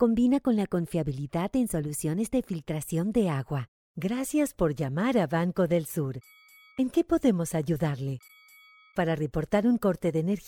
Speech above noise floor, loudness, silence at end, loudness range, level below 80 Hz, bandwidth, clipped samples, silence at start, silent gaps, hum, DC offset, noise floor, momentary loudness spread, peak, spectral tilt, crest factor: 29 dB; -28 LUFS; 0 s; 2 LU; -52 dBFS; 19 kHz; under 0.1%; 0 s; 3.68-3.95 s; none; under 0.1%; -56 dBFS; 10 LU; -10 dBFS; -6.5 dB/octave; 16 dB